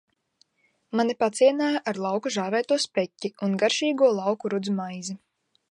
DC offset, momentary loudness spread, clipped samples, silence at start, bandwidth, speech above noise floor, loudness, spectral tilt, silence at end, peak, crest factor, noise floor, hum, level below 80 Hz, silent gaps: under 0.1%; 10 LU; under 0.1%; 0.95 s; 11.5 kHz; 46 dB; -25 LUFS; -4.5 dB/octave; 0.55 s; -8 dBFS; 18 dB; -70 dBFS; none; -78 dBFS; none